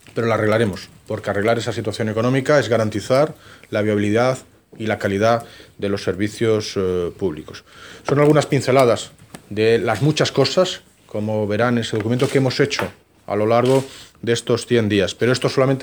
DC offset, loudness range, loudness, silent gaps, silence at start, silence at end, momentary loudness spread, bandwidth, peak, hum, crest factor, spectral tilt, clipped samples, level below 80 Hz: under 0.1%; 3 LU; -19 LUFS; none; 0.15 s; 0 s; 12 LU; over 20 kHz; -2 dBFS; none; 18 dB; -5.5 dB/octave; under 0.1%; -56 dBFS